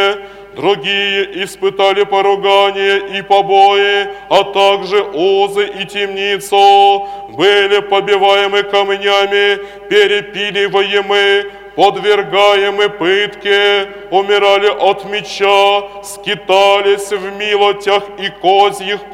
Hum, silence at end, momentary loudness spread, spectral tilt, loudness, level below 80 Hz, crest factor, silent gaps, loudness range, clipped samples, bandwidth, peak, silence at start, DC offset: none; 0 s; 8 LU; -3 dB/octave; -12 LUFS; -52 dBFS; 12 dB; none; 2 LU; 0.2%; 14.5 kHz; 0 dBFS; 0 s; under 0.1%